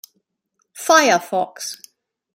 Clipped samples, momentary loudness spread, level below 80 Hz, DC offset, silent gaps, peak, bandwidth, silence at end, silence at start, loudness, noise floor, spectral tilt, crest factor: under 0.1%; 17 LU; -74 dBFS; under 0.1%; none; -2 dBFS; 16.5 kHz; 0.6 s; 0.75 s; -17 LUFS; -71 dBFS; -1.5 dB/octave; 20 dB